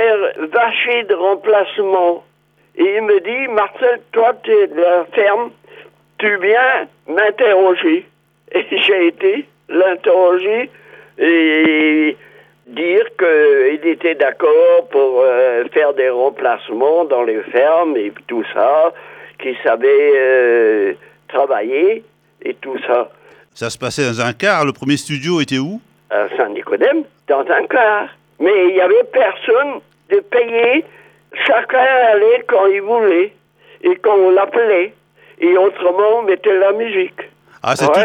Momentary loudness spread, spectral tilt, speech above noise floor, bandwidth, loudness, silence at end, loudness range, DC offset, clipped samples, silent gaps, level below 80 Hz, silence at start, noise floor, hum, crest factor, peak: 10 LU; -5 dB/octave; 29 dB; 11 kHz; -14 LUFS; 0 s; 4 LU; under 0.1%; under 0.1%; none; -66 dBFS; 0 s; -42 dBFS; none; 14 dB; 0 dBFS